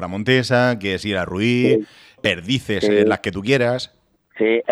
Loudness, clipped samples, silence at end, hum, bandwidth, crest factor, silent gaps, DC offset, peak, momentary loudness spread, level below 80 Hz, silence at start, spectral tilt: -19 LUFS; under 0.1%; 0 s; none; 13 kHz; 16 dB; none; under 0.1%; -2 dBFS; 6 LU; -52 dBFS; 0 s; -6 dB/octave